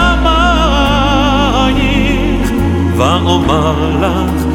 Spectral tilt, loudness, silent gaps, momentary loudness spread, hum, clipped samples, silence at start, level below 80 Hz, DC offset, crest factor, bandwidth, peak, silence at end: -6 dB/octave; -11 LUFS; none; 3 LU; none; under 0.1%; 0 s; -18 dBFS; under 0.1%; 10 dB; 16 kHz; 0 dBFS; 0 s